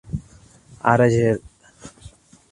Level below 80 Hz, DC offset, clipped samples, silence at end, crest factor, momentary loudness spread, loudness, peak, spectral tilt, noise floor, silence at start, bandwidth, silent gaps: -46 dBFS; under 0.1%; under 0.1%; 0.45 s; 22 dB; 24 LU; -19 LUFS; 0 dBFS; -7.5 dB/octave; -49 dBFS; 0.1 s; 11 kHz; none